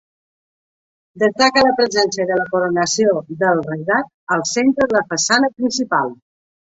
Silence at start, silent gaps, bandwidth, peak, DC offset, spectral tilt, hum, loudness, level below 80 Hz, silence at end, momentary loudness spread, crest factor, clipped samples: 1.15 s; 4.14-4.27 s; 8 kHz; -2 dBFS; under 0.1%; -3 dB/octave; none; -17 LUFS; -58 dBFS; 0.55 s; 6 LU; 16 dB; under 0.1%